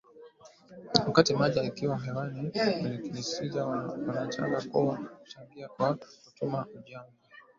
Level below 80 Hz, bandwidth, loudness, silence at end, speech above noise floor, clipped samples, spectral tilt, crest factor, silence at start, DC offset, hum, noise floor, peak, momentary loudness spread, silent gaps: -66 dBFS; 7.6 kHz; -30 LUFS; 0.15 s; 24 dB; under 0.1%; -5.5 dB/octave; 28 dB; 0.15 s; under 0.1%; none; -55 dBFS; -2 dBFS; 21 LU; none